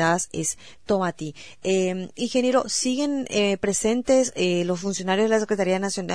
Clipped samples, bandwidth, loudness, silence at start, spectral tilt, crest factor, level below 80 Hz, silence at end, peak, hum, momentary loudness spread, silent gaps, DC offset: under 0.1%; 11 kHz; -23 LUFS; 0 s; -4 dB/octave; 16 dB; -56 dBFS; 0 s; -8 dBFS; none; 7 LU; none; 0.4%